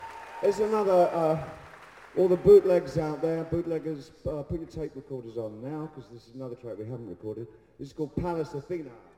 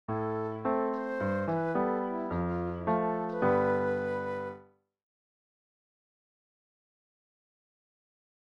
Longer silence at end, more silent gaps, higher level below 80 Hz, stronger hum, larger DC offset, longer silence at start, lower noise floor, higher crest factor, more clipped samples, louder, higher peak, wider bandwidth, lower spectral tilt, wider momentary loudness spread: second, 0.2 s vs 3.8 s; neither; first, -54 dBFS vs -60 dBFS; neither; neither; about the same, 0 s vs 0.1 s; second, -49 dBFS vs -56 dBFS; about the same, 20 dB vs 18 dB; neither; first, -27 LUFS vs -31 LUFS; first, -8 dBFS vs -16 dBFS; first, 13 kHz vs 6.6 kHz; second, -8 dB/octave vs -9.5 dB/octave; first, 19 LU vs 7 LU